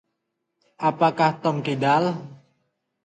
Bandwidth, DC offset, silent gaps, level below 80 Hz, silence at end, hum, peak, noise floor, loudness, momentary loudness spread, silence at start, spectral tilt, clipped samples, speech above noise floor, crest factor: 9.2 kHz; under 0.1%; none; -70 dBFS; 0.7 s; none; -6 dBFS; -78 dBFS; -22 LUFS; 6 LU; 0.8 s; -7 dB/octave; under 0.1%; 57 dB; 20 dB